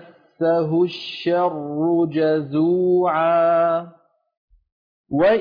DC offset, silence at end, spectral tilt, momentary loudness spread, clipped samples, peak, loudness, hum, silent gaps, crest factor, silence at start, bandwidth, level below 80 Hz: under 0.1%; 0 s; -8.5 dB/octave; 6 LU; under 0.1%; -8 dBFS; -20 LUFS; none; 4.37-4.48 s, 4.72-5.04 s; 12 dB; 0.4 s; 5.2 kHz; -62 dBFS